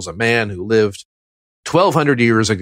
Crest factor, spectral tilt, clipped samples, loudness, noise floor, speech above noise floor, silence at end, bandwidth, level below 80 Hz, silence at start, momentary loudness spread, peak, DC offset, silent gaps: 14 dB; -5 dB/octave; under 0.1%; -16 LUFS; under -90 dBFS; over 75 dB; 0 s; 16 kHz; -52 dBFS; 0 s; 6 LU; -2 dBFS; under 0.1%; 1.05-1.63 s